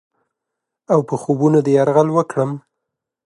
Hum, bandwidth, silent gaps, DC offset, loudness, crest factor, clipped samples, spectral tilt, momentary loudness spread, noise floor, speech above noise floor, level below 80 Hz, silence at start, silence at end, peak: none; 11.5 kHz; none; under 0.1%; -17 LUFS; 16 dB; under 0.1%; -8 dB/octave; 8 LU; -81 dBFS; 65 dB; -68 dBFS; 0.9 s; 0.7 s; -2 dBFS